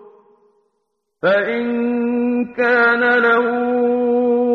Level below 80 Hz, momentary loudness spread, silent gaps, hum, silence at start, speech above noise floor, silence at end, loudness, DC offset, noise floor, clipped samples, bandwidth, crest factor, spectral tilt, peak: -62 dBFS; 6 LU; none; none; 1.25 s; 56 dB; 0 s; -16 LUFS; under 0.1%; -72 dBFS; under 0.1%; 5.6 kHz; 14 dB; -7 dB/octave; -4 dBFS